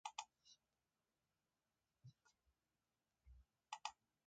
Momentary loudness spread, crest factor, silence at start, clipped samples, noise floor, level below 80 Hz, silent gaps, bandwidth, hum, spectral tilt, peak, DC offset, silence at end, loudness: 16 LU; 34 dB; 0.05 s; under 0.1%; under -90 dBFS; -80 dBFS; none; 8.8 kHz; none; -0.5 dB/octave; -28 dBFS; under 0.1%; 0.35 s; -55 LUFS